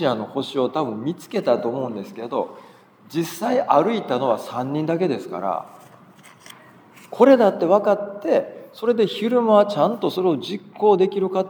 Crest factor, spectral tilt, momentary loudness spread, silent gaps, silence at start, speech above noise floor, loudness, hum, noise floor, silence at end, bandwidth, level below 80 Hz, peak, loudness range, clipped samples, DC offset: 20 dB; -6.5 dB/octave; 12 LU; none; 0 s; 28 dB; -21 LUFS; none; -48 dBFS; 0 s; over 20 kHz; -78 dBFS; -2 dBFS; 7 LU; under 0.1%; under 0.1%